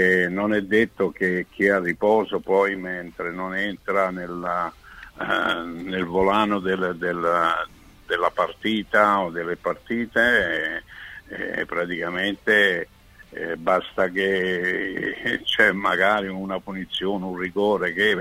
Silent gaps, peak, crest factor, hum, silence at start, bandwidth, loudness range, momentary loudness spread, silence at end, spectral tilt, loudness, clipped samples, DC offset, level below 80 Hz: none; -4 dBFS; 20 dB; none; 0 s; 16 kHz; 3 LU; 11 LU; 0 s; -5.5 dB/octave; -23 LUFS; under 0.1%; under 0.1%; -54 dBFS